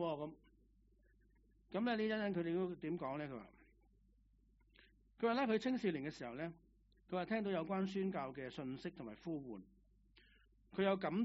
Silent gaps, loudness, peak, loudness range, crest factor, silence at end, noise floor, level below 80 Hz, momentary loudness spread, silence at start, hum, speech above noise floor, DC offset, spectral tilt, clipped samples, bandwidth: none; -42 LUFS; -22 dBFS; 4 LU; 20 dB; 0 s; -72 dBFS; -72 dBFS; 12 LU; 0 s; none; 31 dB; under 0.1%; -5 dB/octave; under 0.1%; 6 kHz